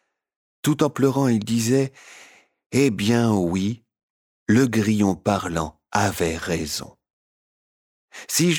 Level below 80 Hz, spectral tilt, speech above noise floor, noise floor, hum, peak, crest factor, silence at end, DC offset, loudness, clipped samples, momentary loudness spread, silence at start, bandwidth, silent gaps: -50 dBFS; -5 dB/octave; over 69 dB; under -90 dBFS; none; -6 dBFS; 16 dB; 0 s; under 0.1%; -22 LUFS; under 0.1%; 9 LU; 0.65 s; over 20 kHz; 2.66-2.70 s, 4.03-4.46 s, 7.10-8.08 s